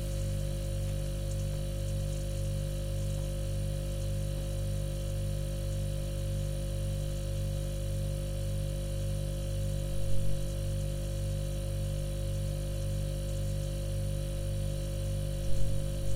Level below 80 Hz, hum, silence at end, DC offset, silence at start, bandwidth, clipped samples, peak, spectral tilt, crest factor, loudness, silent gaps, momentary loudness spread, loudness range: -36 dBFS; 50 Hz at -35 dBFS; 0 s; under 0.1%; 0 s; 16 kHz; under 0.1%; -16 dBFS; -6 dB/octave; 16 dB; -35 LUFS; none; 1 LU; 0 LU